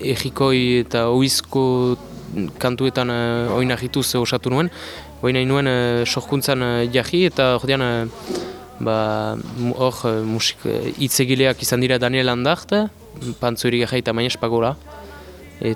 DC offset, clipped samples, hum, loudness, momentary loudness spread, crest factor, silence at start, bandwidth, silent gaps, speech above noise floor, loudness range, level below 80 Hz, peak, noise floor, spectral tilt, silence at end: under 0.1%; under 0.1%; none; -20 LUFS; 10 LU; 18 dB; 0 s; 19 kHz; none; 20 dB; 3 LU; -46 dBFS; -2 dBFS; -39 dBFS; -4.5 dB/octave; 0 s